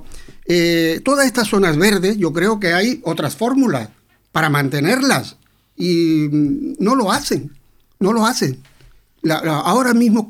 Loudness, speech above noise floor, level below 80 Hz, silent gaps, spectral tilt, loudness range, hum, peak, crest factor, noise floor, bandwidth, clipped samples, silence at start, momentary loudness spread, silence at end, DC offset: -17 LUFS; 33 dB; -46 dBFS; none; -5 dB/octave; 3 LU; none; -2 dBFS; 16 dB; -48 dBFS; 18 kHz; under 0.1%; 0 s; 9 LU; 0 s; under 0.1%